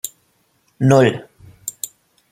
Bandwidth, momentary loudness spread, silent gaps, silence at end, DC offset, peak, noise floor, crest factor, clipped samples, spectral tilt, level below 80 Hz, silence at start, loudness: 16.5 kHz; 18 LU; none; 0.45 s; under 0.1%; -2 dBFS; -62 dBFS; 18 dB; under 0.1%; -6 dB/octave; -58 dBFS; 0.05 s; -16 LUFS